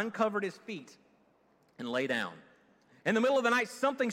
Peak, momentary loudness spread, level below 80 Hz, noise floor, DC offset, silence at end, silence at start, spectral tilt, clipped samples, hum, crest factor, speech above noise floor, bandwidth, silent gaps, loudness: -14 dBFS; 16 LU; -82 dBFS; -68 dBFS; under 0.1%; 0 s; 0 s; -4.5 dB/octave; under 0.1%; none; 18 dB; 37 dB; 16 kHz; none; -31 LUFS